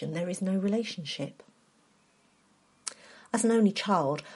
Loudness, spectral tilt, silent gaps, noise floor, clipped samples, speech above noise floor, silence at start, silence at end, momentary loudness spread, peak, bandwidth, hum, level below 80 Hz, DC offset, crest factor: -30 LUFS; -5 dB/octave; none; -66 dBFS; under 0.1%; 37 dB; 0 s; 0 s; 16 LU; -10 dBFS; 11.5 kHz; none; -78 dBFS; under 0.1%; 22 dB